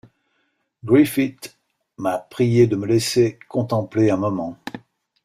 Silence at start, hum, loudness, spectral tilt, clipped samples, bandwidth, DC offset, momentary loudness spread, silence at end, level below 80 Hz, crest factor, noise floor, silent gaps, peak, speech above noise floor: 0.85 s; none; -20 LUFS; -6.5 dB/octave; under 0.1%; 15.5 kHz; under 0.1%; 20 LU; 0.45 s; -56 dBFS; 18 dB; -70 dBFS; none; -4 dBFS; 51 dB